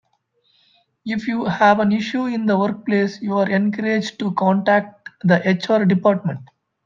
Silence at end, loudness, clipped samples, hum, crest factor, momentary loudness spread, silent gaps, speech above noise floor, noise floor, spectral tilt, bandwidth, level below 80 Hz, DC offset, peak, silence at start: 0.4 s; -19 LUFS; under 0.1%; none; 18 dB; 9 LU; none; 47 dB; -65 dBFS; -7 dB/octave; 7.4 kHz; -64 dBFS; under 0.1%; -2 dBFS; 1.05 s